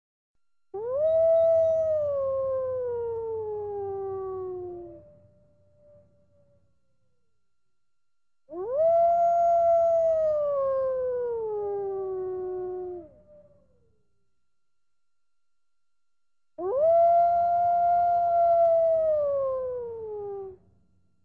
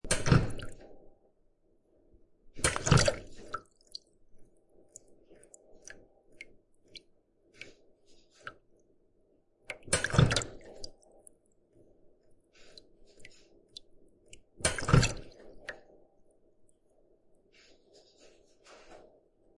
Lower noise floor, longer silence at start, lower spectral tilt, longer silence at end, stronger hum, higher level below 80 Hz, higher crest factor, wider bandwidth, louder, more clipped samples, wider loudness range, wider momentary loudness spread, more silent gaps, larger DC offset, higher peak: first, -87 dBFS vs -69 dBFS; first, 0.75 s vs 0.05 s; first, -8.5 dB/octave vs -4.5 dB/octave; about the same, 0.7 s vs 0.6 s; neither; second, -62 dBFS vs -48 dBFS; second, 12 dB vs 26 dB; second, 2.2 kHz vs 11.5 kHz; first, -25 LUFS vs -29 LUFS; neither; second, 16 LU vs 21 LU; second, 15 LU vs 28 LU; neither; neither; second, -14 dBFS vs -8 dBFS